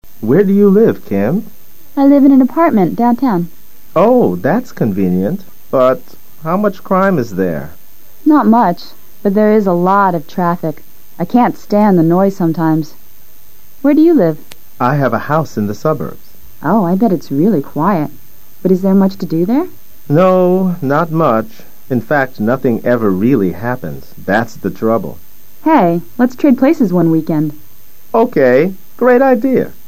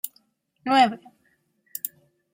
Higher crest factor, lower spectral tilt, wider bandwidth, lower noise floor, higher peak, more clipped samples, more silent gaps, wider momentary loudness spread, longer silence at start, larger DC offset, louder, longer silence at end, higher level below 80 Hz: second, 14 dB vs 22 dB; first, -8.5 dB/octave vs -3 dB/octave; about the same, 15.5 kHz vs 16.5 kHz; second, -44 dBFS vs -68 dBFS; first, 0 dBFS vs -6 dBFS; neither; neither; second, 11 LU vs 18 LU; about the same, 0 s vs 0.05 s; first, 5% vs under 0.1%; first, -13 LUFS vs -24 LUFS; second, 0.2 s vs 0.45 s; first, -50 dBFS vs -76 dBFS